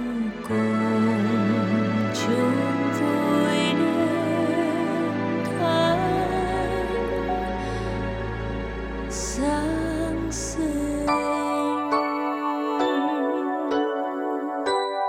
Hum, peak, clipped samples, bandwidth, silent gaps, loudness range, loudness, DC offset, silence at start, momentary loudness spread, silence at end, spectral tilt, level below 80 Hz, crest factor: none; -10 dBFS; under 0.1%; 14.5 kHz; none; 5 LU; -24 LUFS; under 0.1%; 0 s; 7 LU; 0 s; -5.5 dB/octave; -40 dBFS; 14 dB